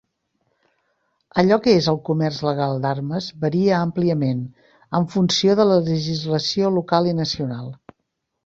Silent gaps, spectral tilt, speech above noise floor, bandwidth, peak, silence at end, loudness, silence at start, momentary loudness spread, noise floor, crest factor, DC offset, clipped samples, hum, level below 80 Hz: none; -6 dB/octave; 57 dB; 7.8 kHz; -2 dBFS; 0.7 s; -20 LUFS; 1.35 s; 10 LU; -76 dBFS; 18 dB; under 0.1%; under 0.1%; none; -56 dBFS